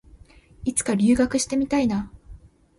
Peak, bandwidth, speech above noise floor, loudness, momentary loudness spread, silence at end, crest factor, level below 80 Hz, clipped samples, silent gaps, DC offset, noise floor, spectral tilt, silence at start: -8 dBFS; 11.5 kHz; 28 dB; -22 LUFS; 11 LU; 0.4 s; 16 dB; -46 dBFS; under 0.1%; none; under 0.1%; -50 dBFS; -4.5 dB/octave; 0.6 s